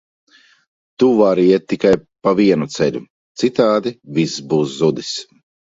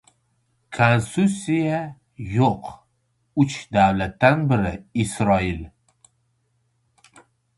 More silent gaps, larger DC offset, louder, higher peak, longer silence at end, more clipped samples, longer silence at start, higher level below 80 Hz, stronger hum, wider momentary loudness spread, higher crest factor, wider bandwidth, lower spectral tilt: first, 3.10-3.35 s vs none; neither; first, -16 LUFS vs -21 LUFS; about the same, 0 dBFS vs -2 dBFS; second, 0.5 s vs 1.9 s; neither; first, 1 s vs 0.7 s; second, -56 dBFS vs -46 dBFS; neither; second, 11 LU vs 16 LU; second, 16 dB vs 22 dB; second, 7.8 kHz vs 11.5 kHz; about the same, -6 dB/octave vs -6.5 dB/octave